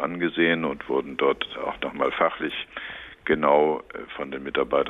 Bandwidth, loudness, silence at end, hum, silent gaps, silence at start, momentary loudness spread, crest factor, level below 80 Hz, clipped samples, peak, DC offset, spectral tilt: 4 kHz; -25 LUFS; 0 s; none; none; 0 s; 14 LU; 18 dB; -56 dBFS; under 0.1%; -6 dBFS; under 0.1%; -7 dB/octave